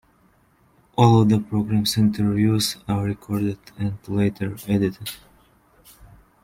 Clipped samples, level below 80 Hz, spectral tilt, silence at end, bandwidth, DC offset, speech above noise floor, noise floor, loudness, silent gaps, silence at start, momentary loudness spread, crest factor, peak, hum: under 0.1%; -52 dBFS; -6 dB/octave; 1.25 s; 16.5 kHz; under 0.1%; 39 dB; -59 dBFS; -21 LUFS; none; 1 s; 13 LU; 20 dB; -2 dBFS; none